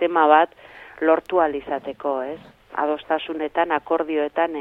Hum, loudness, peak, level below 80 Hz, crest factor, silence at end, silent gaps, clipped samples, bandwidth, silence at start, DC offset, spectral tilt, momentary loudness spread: none; -22 LUFS; -2 dBFS; -60 dBFS; 20 dB; 0 s; none; under 0.1%; 4.8 kHz; 0 s; under 0.1%; -6.5 dB/octave; 13 LU